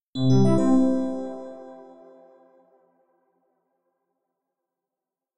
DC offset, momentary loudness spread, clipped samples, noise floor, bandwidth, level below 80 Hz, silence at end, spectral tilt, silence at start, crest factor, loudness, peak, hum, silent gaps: under 0.1%; 22 LU; under 0.1%; -88 dBFS; 10.5 kHz; -54 dBFS; 0 s; -8 dB/octave; 0 s; 16 dB; -21 LUFS; -10 dBFS; none; 0.02-0.13 s